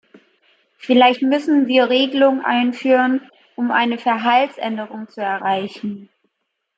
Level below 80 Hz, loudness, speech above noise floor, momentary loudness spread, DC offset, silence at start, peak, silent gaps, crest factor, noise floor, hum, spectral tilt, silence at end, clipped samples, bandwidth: -72 dBFS; -17 LUFS; 58 dB; 15 LU; under 0.1%; 0.85 s; -2 dBFS; none; 16 dB; -75 dBFS; none; -5.5 dB/octave; 0.75 s; under 0.1%; 7.6 kHz